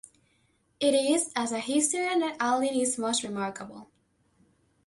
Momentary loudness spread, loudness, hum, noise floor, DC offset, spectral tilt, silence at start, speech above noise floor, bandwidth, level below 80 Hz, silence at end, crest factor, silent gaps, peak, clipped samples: 9 LU; -27 LUFS; none; -69 dBFS; under 0.1%; -2.5 dB/octave; 0.8 s; 42 dB; 11.5 kHz; -72 dBFS; 1 s; 18 dB; none; -12 dBFS; under 0.1%